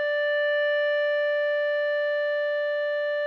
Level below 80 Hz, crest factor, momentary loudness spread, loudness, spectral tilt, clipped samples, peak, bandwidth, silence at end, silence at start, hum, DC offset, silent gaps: under -90 dBFS; 6 dB; 3 LU; -25 LUFS; 1 dB/octave; under 0.1%; -18 dBFS; 5.6 kHz; 0 s; 0 s; 50 Hz at -85 dBFS; under 0.1%; none